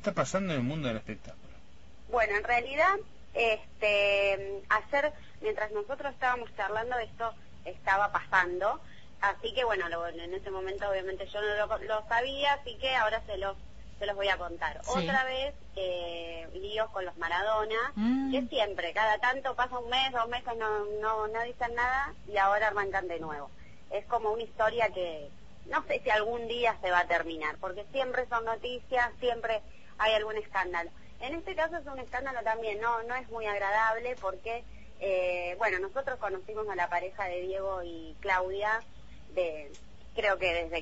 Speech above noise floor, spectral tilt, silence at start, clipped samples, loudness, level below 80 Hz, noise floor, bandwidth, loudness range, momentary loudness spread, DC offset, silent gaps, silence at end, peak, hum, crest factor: 24 dB; -4.5 dB/octave; 0 s; under 0.1%; -31 LUFS; -54 dBFS; -56 dBFS; 8 kHz; 4 LU; 11 LU; 0.5%; none; 0 s; -10 dBFS; none; 22 dB